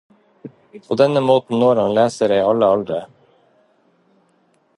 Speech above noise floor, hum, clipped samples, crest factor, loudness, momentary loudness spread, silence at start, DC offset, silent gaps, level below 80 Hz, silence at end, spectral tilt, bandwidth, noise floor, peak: 44 dB; none; under 0.1%; 18 dB; -17 LUFS; 11 LU; 0.45 s; under 0.1%; none; -60 dBFS; 1.7 s; -6.5 dB/octave; 11 kHz; -60 dBFS; -2 dBFS